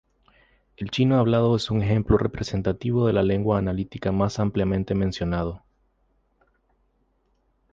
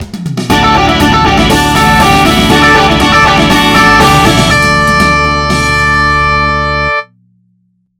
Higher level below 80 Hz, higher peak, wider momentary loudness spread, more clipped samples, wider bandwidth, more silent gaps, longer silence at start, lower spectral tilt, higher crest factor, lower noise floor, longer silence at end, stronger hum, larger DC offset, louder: second, -42 dBFS vs -22 dBFS; second, -6 dBFS vs 0 dBFS; about the same, 8 LU vs 6 LU; second, under 0.1% vs 1%; second, 7.8 kHz vs 19.5 kHz; neither; first, 0.8 s vs 0 s; first, -7.5 dB/octave vs -4 dB/octave; first, 18 dB vs 8 dB; first, -68 dBFS vs -55 dBFS; first, 2.15 s vs 0.95 s; neither; neither; second, -23 LUFS vs -7 LUFS